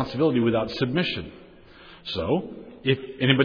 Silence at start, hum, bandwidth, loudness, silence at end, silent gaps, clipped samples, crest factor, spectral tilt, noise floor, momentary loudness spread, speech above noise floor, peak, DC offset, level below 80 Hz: 0 s; none; 5.4 kHz; -25 LUFS; 0 s; none; under 0.1%; 20 dB; -8 dB/octave; -48 dBFS; 14 LU; 24 dB; -6 dBFS; under 0.1%; -52 dBFS